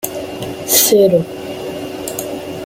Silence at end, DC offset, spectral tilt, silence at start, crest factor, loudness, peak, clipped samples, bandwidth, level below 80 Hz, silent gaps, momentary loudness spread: 0 s; under 0.1%; -3 dB/octave; 0 s; 16 dB; -15 LUFS; 0 dBFS; under 0.1%; 17 kHz; -52 dBFS; none; 15 LU